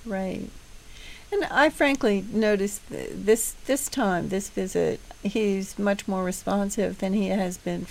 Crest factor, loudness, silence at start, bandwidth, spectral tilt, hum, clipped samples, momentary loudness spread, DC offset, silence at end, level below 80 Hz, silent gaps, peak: 20 dB; -26 LUFS; 0 s; 16 kHz; -4.5 dB/octave; none; under 0.1%; 11 LU; under 0.1%; 0 s; -48 dBFS; none; -6 dBFS